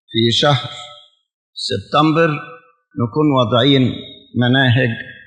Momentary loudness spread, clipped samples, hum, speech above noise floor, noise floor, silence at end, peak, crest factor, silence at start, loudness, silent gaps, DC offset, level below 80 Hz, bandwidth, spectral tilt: 19 LU; under 0.1%; none; 28 dB; -43 dBFS; 0.1 s; 0 dBFS; 16 dB; 0.1 s; -16 LUFS; 1.34-1.53 s; under 0.1%; -58 dBFS; 9.8 kHz; -6 dB/octave